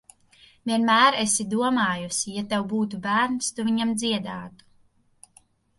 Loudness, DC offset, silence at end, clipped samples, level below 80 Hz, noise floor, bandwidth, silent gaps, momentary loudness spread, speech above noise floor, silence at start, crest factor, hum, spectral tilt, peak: -23 LUFS; under 0.1%; 1.3 s; under 0.1%; -64 dBFS; -61 dBFS; 11.5 kHz; none; 11 LU; 38 dB; 0.65 s; 20 dB; none; -3 dB/octave; -6 dBFS